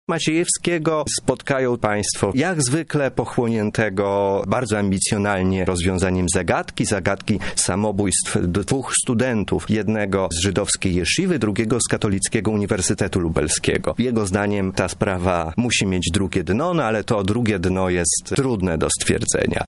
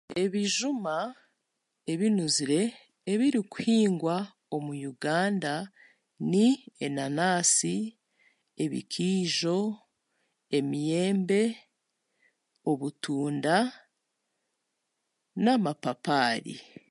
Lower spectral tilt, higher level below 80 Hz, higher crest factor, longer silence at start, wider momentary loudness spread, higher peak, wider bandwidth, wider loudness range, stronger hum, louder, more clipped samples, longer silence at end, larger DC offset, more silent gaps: about the same, -4.5 dB/octave vs -4 dB/octave; first, -40 dBFS vs -78 dBFS; about the same, 16 dB vs 20 dB; about the same, 0.1 s vs 0.1 s; second, 3 LU vs 11 LU; first, -4 dBFS vs -10 dBFS; about the same, 11.5 kHz vs 11.5 kHz; second, 1 LU vs 4 LU; neither; first, -20 LUFS vs -28 LUFS; neither; second, 0 s vs 0.3 s; first, 0.2% vs under 0.1%; neither